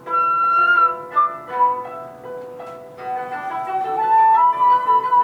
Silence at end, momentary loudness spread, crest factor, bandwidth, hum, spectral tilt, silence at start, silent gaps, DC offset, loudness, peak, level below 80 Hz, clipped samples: 0 s; 20 LU; 12 dB; 7.4 kHz; none; -4.5 dB/octave; 0 s; none; under 0.1%; -17 LUFS; -6 dBFS; -68 dBFS; under 0.1%